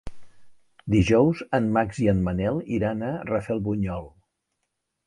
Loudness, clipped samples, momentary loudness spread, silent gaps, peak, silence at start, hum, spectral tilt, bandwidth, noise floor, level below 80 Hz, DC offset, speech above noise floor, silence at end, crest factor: -24 LUFS; under 0.1%; 9 LU; none; -6 dBFS; 0.05 s; none; -7.5 dB/octave; 11 kHz; -79 dBFS; -44 dBFS; under 0.1%; 56 dB; 1 s; 20 dB